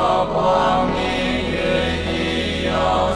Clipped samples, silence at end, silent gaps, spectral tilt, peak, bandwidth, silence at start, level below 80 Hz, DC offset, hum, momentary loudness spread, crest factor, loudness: under 0.1%; 0 s; none; -5.5 dB/octave; -4 dBFS; 11 kHz; 0 s; -34 dBFS; 0.2%; none; 4 LU; 14 dB; -19 LUFS